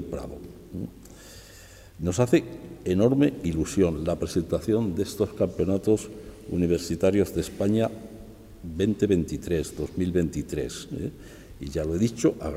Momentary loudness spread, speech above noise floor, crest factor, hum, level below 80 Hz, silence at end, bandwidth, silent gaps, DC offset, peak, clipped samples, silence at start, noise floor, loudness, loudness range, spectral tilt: 19 LU; 22 dB; 18 dB; none; -46 dBFS; 0 s; 16 kHz; none; under 0.1%; -8 dBFS; under 0.1%; 0 s; -48 dBFS; -26 LUFS; 3 LU; -6.5 dB/octave